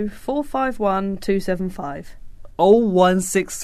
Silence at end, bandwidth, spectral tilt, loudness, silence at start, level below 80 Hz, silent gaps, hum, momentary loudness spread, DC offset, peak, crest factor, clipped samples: 0 s; 13.5 kHz; -5.5 dB/octave; -19 LUFS; 0 s; -40 dBFS; none; none; 16 LU; under 0.1%; -2 dBFS; 16 dB; under 0.1%